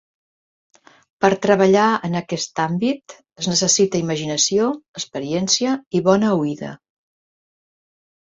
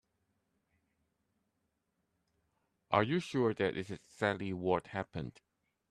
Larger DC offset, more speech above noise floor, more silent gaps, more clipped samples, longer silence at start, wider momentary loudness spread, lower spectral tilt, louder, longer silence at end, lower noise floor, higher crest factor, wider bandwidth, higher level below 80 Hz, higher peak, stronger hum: neither; first, over 71 dB vs 48 dB; first, 4.88-4.94 s, 5.86-5.91 s vs none; neither; second, 1.2 s vs 2.9 s; about the same, 12 LU vs 12 LU; second, -4 dB/octave vs -6.5 dB/octave; first, -19 LUFS vs -35 LUFS; first, 1.5 s vs 0.6 s; first, under -90 dBFS vs -83 dBFS; second, 20 dB vs 26 dB; second, 8 kHz vs 12 kHz; first, -60 dBFS vs -70 dBFS; first, 0 dBFS vs -12 dBFS; neither